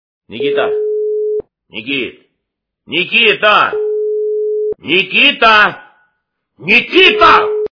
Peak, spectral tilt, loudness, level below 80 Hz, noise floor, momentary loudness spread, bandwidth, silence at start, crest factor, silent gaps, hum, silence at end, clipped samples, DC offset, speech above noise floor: 0 dBFS; -4.5 dB/octave; -11 LUFS; -50 dBFS; -75 dBFS; 13 LU; 5.4 kHz; 0.3 s; 14 dB; none; none; 0.05 s; 0.4%; under 0.1%; 64 dB